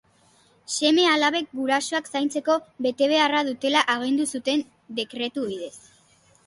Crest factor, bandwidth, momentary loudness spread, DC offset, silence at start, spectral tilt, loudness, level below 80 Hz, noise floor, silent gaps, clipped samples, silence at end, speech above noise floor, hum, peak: 18 dB; 11.5 kHz; 12 LU; under 0.1%; 0.7 s; -2 dB/octave; -23 LUFS; -72 dBFS; -59 dBFS; none; under 0.1%; 0.65 s; 36 dB; none; -6 dBFS